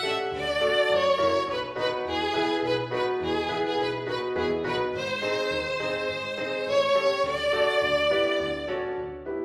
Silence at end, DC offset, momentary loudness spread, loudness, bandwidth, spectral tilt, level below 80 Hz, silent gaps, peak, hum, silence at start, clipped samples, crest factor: 0 s; under 0.1%; 7 LU; -26 LUFS; 13 kHz; -4.5 dB/octave; -54 dBFS; none; -12 dBFS; none; 0 s; under 0.1%; 14 dB